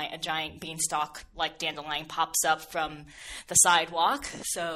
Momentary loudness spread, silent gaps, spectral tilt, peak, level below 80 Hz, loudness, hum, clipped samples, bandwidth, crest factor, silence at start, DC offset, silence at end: 15 LU; none; -0.5 dB/octave; -8 dBFS; -58 dBFS; -27 LUFS; none; under 0.1%; 16 kHz; 22 dB; 0 s; under 0.1%; 0 s